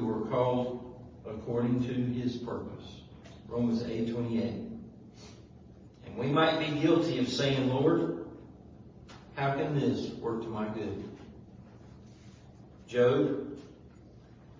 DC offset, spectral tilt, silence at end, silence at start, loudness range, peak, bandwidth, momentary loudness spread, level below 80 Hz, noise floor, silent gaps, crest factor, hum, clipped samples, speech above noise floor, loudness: under 0.1%; -7 dB/octave; 0.05 s; 0 s; 7 LU; -12 dBFS; 7.6 kHz; 25 LU; -58 dBFS; -53 dBFS; none; 20 dB; none; under 0.1%; 24 dB; -31 LUFS